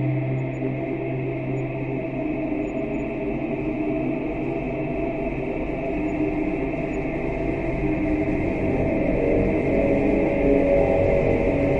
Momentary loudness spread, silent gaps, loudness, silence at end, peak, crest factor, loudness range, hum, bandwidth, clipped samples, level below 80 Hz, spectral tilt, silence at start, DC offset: 7 LU; none; -24 LUFS; 0 s; -6 dBFS; 18 dB; 6 LU; none; 7.6 kHz; under 0.1%; -34 dBFS; -9.5 dB/octave; 0 s; under 0.1%